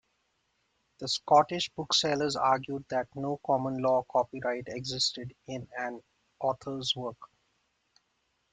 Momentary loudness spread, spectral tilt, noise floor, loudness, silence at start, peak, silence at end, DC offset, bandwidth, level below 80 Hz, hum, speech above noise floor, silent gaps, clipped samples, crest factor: 15 LU; -3.5 dB/octave; -76 dBFS; -30 LUFS; 1 s; -10 dBFS; 1.3 s; under 0.1%; 9.4 kHz; -68 dBFS; none; 46 dB; none; under 0.1%; 22 dB